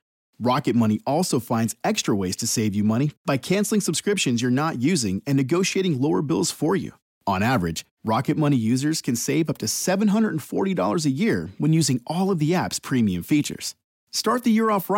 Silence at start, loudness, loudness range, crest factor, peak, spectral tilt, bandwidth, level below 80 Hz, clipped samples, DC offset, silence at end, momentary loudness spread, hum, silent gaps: 0.4 s; -23 LUFS; 1 LU; 12 dB; -10 dBFS; -5 dB/octave; 17 kHz; -62 dBFS; under 0.1%; under 0.1%; 0 s; 5 LU; none; 3.17-3.25 s, 7.02-7.21 s, 7.91-7.97 s, 13.84-14.07 s